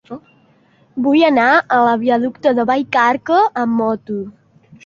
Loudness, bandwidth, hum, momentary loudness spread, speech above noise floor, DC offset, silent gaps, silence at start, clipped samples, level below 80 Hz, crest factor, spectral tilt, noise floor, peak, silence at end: -15 LUFS; 7.2 kHz; none; 15 LU; 39 dB; under 0.1%; none; 0.1 s; under 0.1%; -62 dBFS; 16 dB; -6 dB/octave; -53 dBFS; 0 dBFS; 0.55 s